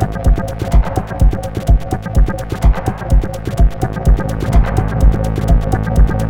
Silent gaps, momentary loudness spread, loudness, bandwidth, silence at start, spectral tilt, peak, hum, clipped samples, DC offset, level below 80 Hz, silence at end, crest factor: none; 4 LU; -16 LUFS; 12 kHz; 0 s; -7.5 dB/octave; 0 dBFS; none; under 0.1%; under 0.1%; -14 dBFS; 0 s; 12 dB